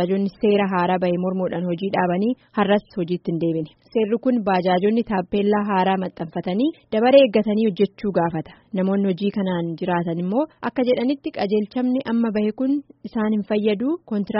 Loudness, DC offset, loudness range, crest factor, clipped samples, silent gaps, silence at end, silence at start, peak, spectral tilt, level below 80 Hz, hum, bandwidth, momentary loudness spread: -21 LUFS; under 0.1%; 3 LU; 18 dB; under 0.1%; none; 0 s; 0 s; -2 dBFS; -6 dB/octave; -58 dBFS; none; 5.8 kHz; 6 LU